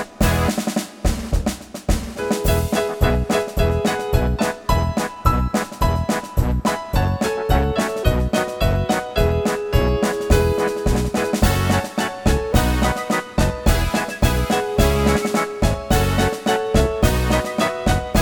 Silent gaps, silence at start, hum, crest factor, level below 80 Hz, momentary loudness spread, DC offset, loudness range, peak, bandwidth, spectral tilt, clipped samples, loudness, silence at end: none; 0 s; none; 18 dB; -24 dBFS; 4 LU; under 0.1%; 2 LU; -2 dBFS; over 20 kHz; -5.5 dB/octave; under 0.1%; -20 LUFS; 0 s